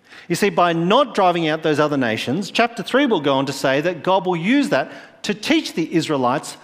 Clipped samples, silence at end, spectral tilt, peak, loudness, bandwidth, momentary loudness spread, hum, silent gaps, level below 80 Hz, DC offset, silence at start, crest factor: under 0.1%; 0.1 s; -5 dB/octave; 0 dBFS; -19 LUFS; 16 kHz; 5 LU; none; none; -62 dBFS; under 0.1%; 0.1 s; 18 dB